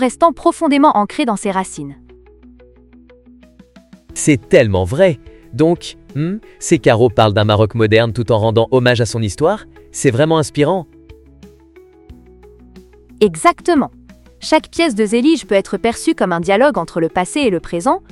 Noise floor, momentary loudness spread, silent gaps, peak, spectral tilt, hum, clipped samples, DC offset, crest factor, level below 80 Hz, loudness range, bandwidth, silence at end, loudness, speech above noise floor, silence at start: -44 dBFS; 10 LU; none; 0 dBFS; -5.5 dB/octave; none; under 0.1%; under 0.1%; 16 dB; -44 dBFS; 6 LU; 12.5 kHz; 0.15 s; -15 LUFS; 30 dB; 0 s